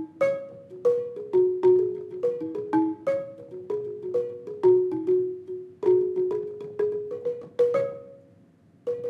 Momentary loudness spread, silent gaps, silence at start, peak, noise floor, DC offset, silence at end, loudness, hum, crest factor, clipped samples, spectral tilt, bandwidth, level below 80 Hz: 13 LU; none; 0 s; -10 dBFS; -57 dBFS; under 0.1%; 0 s; -26 LUFS; none; 16 dB; under 0.1%; -8.5 dB/octave; 4.9 kHz; -74 dBFS